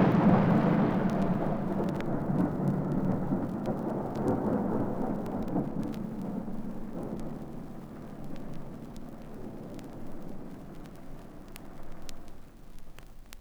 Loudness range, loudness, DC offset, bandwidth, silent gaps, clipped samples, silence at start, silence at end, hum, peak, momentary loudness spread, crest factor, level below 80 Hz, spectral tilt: 16 LU; -30 LUFS; under 0.1%; 18.5 kHz; none; under 0.1%; 0 s; 0 s; none; -12 dBFS; 21 LU; 20 dB; -46 dBFS; -9 dB/octave